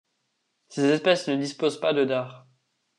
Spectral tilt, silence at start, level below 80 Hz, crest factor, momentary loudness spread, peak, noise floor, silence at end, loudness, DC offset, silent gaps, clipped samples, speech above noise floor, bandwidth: -5 dB/octave; 0.7 s; -78 dBFS; 18 dB; 9 LU; -8 dBFS; -75 dBFS; 0.6 s; -24 LUFS; under 0.1%; none; under 0.1%; 52 dB; 11 kHz